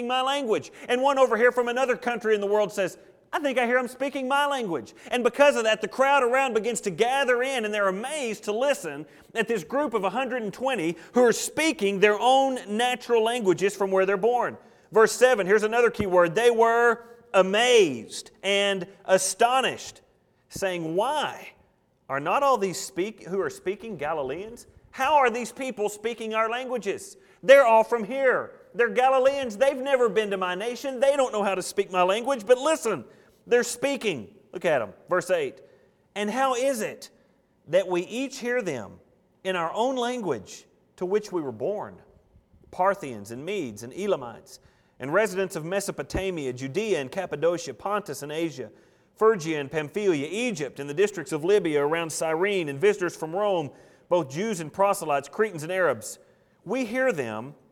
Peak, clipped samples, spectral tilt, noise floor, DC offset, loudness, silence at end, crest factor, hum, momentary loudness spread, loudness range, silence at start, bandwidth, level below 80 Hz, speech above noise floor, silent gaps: -4 dBFS; under 0.1%; -3.5 dB/octave; -64 dBFS; under 0.1%; -25 LUFS; 0.2 s; 22 dB; none; 12 LU; 8 LU; 0 s; 17 kHz; -60 dBFS; 39 dB; none